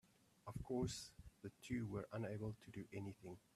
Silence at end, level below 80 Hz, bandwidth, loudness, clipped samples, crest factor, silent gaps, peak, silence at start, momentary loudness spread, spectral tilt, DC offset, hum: 0.15 s; -68 dBFS; 14.5 kHz; -49 LUFS; under 0.1%; 18 dB; none; -32 dBFS; 0.45 s; 14 LU; -6 dB/octave; under 0.1%; none